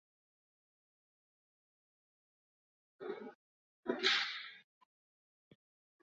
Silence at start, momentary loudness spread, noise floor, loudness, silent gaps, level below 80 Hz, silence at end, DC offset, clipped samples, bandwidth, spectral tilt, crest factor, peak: 3 s; 19 LU; under -90 dBFS; -37 LUFS; 3.35-3.83 s; under -90 dBFS; 1.4 s; under 0.1%; under 0.1%; 7.2 kHz; 1.5 dB/octave; 28 dB; -18 dBFS